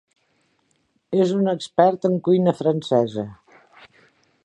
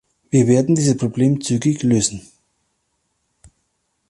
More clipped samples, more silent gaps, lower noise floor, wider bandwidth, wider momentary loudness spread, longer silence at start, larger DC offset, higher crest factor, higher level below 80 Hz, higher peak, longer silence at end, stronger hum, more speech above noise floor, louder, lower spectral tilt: neither; neither; about the same, -67 dBFS vs -70 dBFS; second, 9.6 kHz vs 11.5 kHz; first, 8 LU vs 5 LU; first, 1.1 s vs 0.35 s; neither; about the same, 20 dB vs 16 dB; second, -66 dBFS vs -52 dBFS; about the same, -2 dBFS vs -4 dBFS; second, 1.1 s vs 1.9 s; neither; second, 48 dB vs 54 dB; second, -20 LUFS vs -17 LUFS; first, -7.5 dB/octave vs -6 dB/octave